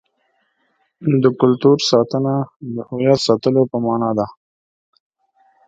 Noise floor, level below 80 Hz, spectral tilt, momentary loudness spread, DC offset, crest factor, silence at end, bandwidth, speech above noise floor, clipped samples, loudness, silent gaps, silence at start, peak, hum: -66 dBFS; -58 dBFS; -6.5 dB/octave; 12 LU; under 0.1%; 18 dB; 1.35 s; 9 kHz; 50 dB; under 0.1%; -17 LUFS; 2.56-2.60 s; 1 s; 0 dBFS; none